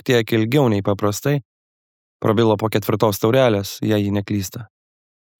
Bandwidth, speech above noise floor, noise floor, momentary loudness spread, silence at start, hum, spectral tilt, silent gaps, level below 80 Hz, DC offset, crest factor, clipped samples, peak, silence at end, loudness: 19 kHz; over 72 dB; under -90 dBFS; 8 LU; 0.05 s; none; -6 dB/octave; 1.45-2.20 s; -60 dBFS; under 0.1%; 16 dB; under 0.1%; -2 dBFS; 0.75 s; -19 LUFS